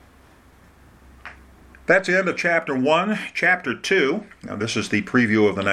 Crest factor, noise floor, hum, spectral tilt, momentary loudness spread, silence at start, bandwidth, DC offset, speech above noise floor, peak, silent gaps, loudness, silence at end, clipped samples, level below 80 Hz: 18 dB; -51 dBFS; none; -5 dB/octave; 15 LU; 1.25 s; 14 kHz; under 0.1%; 31 dB; -4 dBFS; none; -20 LUFS; 0 s; under 0.1%; -56 dBFS